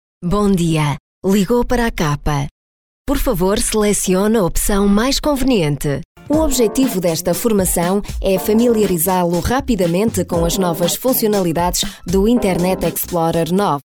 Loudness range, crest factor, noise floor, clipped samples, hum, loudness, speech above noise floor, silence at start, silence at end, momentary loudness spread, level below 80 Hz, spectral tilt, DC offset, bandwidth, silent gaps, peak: 2 LU; 10 dB; under -90 dBFS; under 0.1%; none; -16 LUFS; over 75 dB; 0.2 s; 0.05 s; 5 LU; -28 dBFS; -5 dB/octave; under 0.1%; over 20 kHz; 1.00-1.22 s, 2.51-3.05 s, 6.05-6.15 s; -4 dBFS